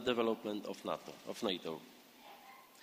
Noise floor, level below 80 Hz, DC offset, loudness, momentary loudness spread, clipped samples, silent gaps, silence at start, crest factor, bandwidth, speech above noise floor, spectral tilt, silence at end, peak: -58 dBFS; -76 dBFS; under 0.1%; -40 LUFS; 21 LU; under 0.1%; none; 0 s; 22 dB; 15.5 kHz; 19 dB; -4.5 dB/octave; 0 s; -20 dBFS